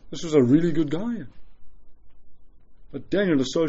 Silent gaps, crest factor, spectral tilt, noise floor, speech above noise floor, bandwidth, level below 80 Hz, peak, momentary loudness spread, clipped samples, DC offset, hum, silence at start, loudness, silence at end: none; 18 dB; -6.5 dB/octave; -44 dBFS; 23 dB; 8 kHz; -52 dBFS; -6 dBFS; 21 LU; under 0.1%; under 0.1%; none; 0.05 s; -23 LUFS; 0 s